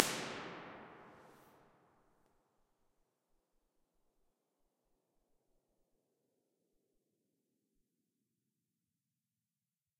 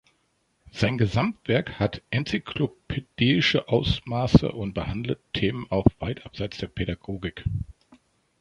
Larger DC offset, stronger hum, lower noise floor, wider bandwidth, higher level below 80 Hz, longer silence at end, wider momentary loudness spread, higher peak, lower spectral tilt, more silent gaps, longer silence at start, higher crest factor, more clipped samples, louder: neither; neither; first, under -90 dBFS vs -70 dBFS; first, 15 kHz vs 10.5 kHz; second, -84 dBFS vs -42 dBFS; first, 8.5 s vs 0.7 s; first, 23 LU vs 13 LU; about the same, -2 dBFS vs -2 dBFS; second, -2 dB/octave vs -7 dB/octave; neither; second, 0 s vs 0.75 s; first, 50 dB vs 24 dB; neither; second, -43 LUFS vs -26 LUFS